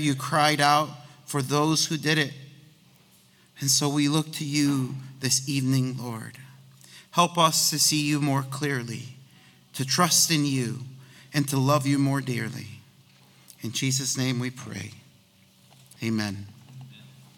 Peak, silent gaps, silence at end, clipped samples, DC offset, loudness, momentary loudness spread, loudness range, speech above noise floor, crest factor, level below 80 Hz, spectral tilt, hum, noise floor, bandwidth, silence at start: -4 dBFS; none; 0.3 s; under 0.1%; under 0.1%; -24 LUFS; 18 LU; 7 LU; 33 dB; 24 dB; -68 dBFS; -3.5 dB/octave; none; -58 dBFS; 18 kHz; 0 s